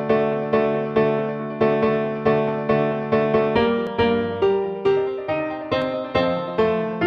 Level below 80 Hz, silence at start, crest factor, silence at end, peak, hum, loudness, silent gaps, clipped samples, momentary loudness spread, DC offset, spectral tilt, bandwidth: -52 dBFS; 0 s; 16 dB; 0 s; -6 dBFS; none; -21 LUFS; none; under 0.1%; 5 LU; under 0.1%; -8 dB/octave; 6.2 kHz